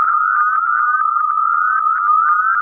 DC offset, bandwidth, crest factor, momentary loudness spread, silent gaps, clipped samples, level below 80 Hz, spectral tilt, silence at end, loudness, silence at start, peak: under 0.1%; 2.5 kHz; 8 dB; 2 LU; none; under 0.1%; -84 dBFS; -2 dB/octave; 0 s; -14 LUFS; 0 s; -6 dBFS